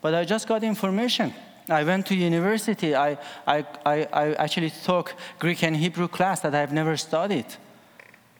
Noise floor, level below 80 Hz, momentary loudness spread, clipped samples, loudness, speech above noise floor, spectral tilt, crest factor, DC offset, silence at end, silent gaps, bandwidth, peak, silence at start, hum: -52 dBFS; -74 dBFS; 5 LU; under 0.1%; -25 LUFS; 28 dB; -5 dB/octave; 20 dB; under 0.1%; 0.8 s; none; over 20 kHz; -4 dBFS; 0.05 s; none